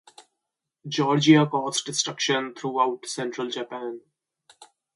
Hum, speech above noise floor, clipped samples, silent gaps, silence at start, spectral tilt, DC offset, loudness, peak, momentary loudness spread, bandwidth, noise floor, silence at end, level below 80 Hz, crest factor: none; 60 dB; under 0.1%; none; 0.2 s; -4 dB/octave; under 0.1%; -24 LUFS; -4 dBFS; 16 LU; 11.5 kHz; -84 dBFS; 0.3 s; -72 dBFS; 22 dB